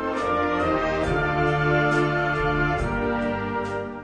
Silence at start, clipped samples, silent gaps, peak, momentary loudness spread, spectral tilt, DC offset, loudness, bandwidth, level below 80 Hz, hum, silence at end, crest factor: 0 s; under 0.1%; none; -10 dBFS; 6 LU; -7 dB/octave; under 0.1%; -23 LUFS; 10 kHz; -38 dBFS; none; 0 s; 14 dB